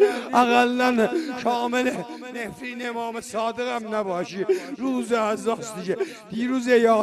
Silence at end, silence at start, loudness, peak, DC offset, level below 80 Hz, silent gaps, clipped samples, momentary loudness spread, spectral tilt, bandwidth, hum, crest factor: 0 s; 0 s; -24 LUFS; -4 dBFS; under 0.1%; -66 dBFS; none; under 0.1%; 12 LU; -4.5 dB/octave; 13 kHz; none; 20 dB